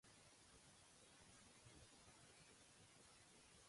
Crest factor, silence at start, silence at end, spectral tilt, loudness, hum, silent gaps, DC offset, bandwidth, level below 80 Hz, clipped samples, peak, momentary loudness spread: 16 dB; 0.05 s; 0 s; -2.5 dB/octave; -67 LUFS; none; none; under 0.1%; 11.5 kHz; -82 dBFS; under 0.1%; -54 dBFS; 1 LU